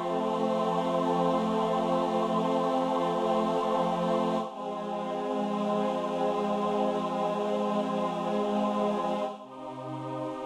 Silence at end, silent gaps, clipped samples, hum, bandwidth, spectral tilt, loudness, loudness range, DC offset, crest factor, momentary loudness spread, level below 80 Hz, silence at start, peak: 0 s; none; under 0.1%; none; 12.5 kHz; -6.5 dB/octave; -29 LUFS; 2 LU; under 0.1%; 14 dB; 8 LU; -66 dBFS; 0 s; -14 dBFS